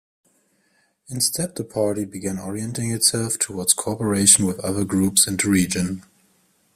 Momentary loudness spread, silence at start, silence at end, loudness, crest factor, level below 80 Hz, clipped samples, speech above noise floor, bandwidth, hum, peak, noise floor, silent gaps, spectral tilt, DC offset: 13 LU; 1.1 s; 0.75 s; -20 LUFS; 22 dB; -56 dBFS; under 0.1%; 44 dB; 16 kHz; none; 0 dBFS; -65 dBFS; none; -3 dB/octave; under 0.1%